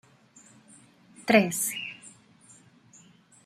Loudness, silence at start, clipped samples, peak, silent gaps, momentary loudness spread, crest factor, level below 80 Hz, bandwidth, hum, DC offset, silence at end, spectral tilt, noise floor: -26 LUFS; 1.2 s; under 0.1%; -4 dBFS; none; 24 LU; 26 dB; -76 dBFS; 16 kHz; none; under 0.1%; 1.35 s; -3.5 dB/octave; -57 dBFS